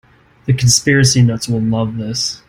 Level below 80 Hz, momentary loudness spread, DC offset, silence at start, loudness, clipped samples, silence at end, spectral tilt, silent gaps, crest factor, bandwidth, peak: -42 dBFS; 9 LU; under 0.1%; 0.45 s; -14 LUFS; under 0.1%; 0.1 s; -4 dB/octave; none; 14 dB; 16.5 kHz; 0 dBFS